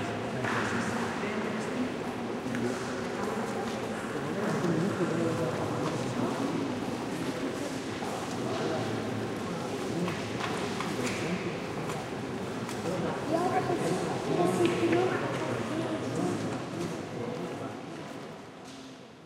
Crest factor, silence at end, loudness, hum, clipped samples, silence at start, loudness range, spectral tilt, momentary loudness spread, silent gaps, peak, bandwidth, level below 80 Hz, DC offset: 20 dB; 0 s; -32 LUFS; none; under 0.1%; 0 s; 4 LU; -5.5 dB/octave; 7 LU; none; -12 dBFS; 16 kHz; -62 dBFS; under 0.1%